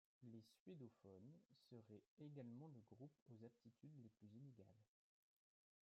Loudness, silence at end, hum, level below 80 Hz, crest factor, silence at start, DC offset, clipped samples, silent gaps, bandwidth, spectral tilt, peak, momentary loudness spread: -65 LUFS; 0.95 s; none; under -90 dBFS; 18 dB; 0.2 s; under 0.1%; under 0.1%; 0.60-0.66 s, 2.07-2.17 s, 3.22-3.26 s; 6.6 kHz; -8.5 dB/octave; -46 dBFS; 7 LU